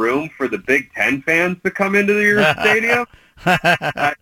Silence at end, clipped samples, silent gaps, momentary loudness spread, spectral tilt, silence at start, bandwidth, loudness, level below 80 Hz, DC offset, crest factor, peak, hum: 0.05 s; under 0.1%; none; 8 LU; -5 dB/octave; 0 s; 17 kHz; -16 LUFS; -52 dBFS; under 0.1%; 14 dB; -2 dBFS; none